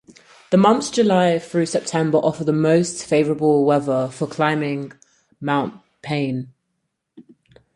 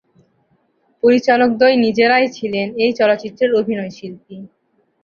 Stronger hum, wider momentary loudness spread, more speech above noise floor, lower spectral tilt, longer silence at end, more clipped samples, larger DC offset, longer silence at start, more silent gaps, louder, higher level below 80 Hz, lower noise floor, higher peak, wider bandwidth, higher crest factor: neither; second, 13 LU vs 20 LU; first, 56 dB vs 46 dB; about the same, -6 dB/octave vs -5.5 dB/octave; about the same, 0.55 s vs 0.55 s; neither; neither; second, 0.5 s vs 1.05 s; neither; second, -19 LUFS vs -15 LUFS; about the same, -60 dBFS vs -62 dBFS; first, -75 dBFS vs -61 dBFS; about the same, -2 dBFS vs -2 dBFS; first, 11.5 kHz vs 7 kHz; about the same, 18 dB vs 16 dB